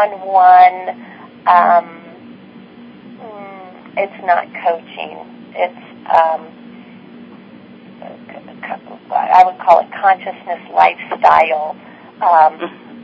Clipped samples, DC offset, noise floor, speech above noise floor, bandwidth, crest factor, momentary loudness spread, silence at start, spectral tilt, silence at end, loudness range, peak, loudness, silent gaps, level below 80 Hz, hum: 0.2%; under 0.1%; -38 dBFS; 25 dB; 5.8 kHz; 16 dB; 24 LU; 0 s; -5.5 dB/octave; 0.05 s; 9 LU; 0 dBFS; -13 LUFS; none; -62 dBFS; none